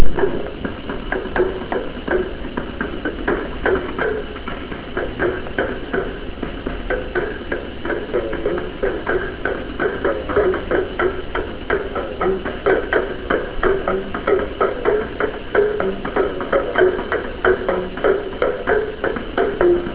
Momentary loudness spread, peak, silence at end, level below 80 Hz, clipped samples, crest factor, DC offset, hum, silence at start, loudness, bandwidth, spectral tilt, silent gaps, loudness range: 8 LU; 0 dBFS; 0 s; -32 dBFS; under 0.1%; 20 dB; 0.4%; none; 0 s; -21 LUFS; 4 kHz; -10 dB/octave; none; 5 LU